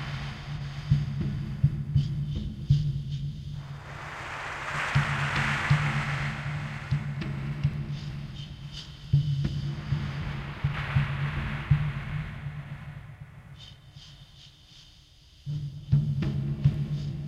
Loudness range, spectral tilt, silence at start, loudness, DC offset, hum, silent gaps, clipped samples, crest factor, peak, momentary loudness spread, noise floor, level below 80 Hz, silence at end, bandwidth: 6 LU; -6.5 dB/octave; 0 s; -30 LUFS; under 0.1%; none; none; under 0.1%; 20 dB; -10 dBFS; 18 LU; -55 dBFS; -42 dBFS; 0 s; 9.4 kHz